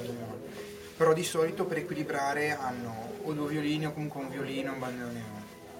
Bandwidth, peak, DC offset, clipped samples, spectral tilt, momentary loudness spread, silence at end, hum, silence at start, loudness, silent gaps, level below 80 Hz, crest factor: 16.5 kHz; -12 dBFS; under 0.1%; under 0.1%; -5 dB/octave; 14 LU; 0 s; none; 0 s; -32 LUFS; none; -66 dBFS; 20 dB